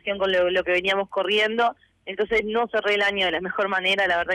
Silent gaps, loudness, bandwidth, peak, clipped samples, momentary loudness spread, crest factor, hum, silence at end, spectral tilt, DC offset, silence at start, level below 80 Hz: none; -22 LUFS; 13 kHz; -14 dBFS; under 0.1%; 5 LU; 10 dB; none; 0 s; -4 dB/octave; under 0.1%; 0.05 s; -54 dBFS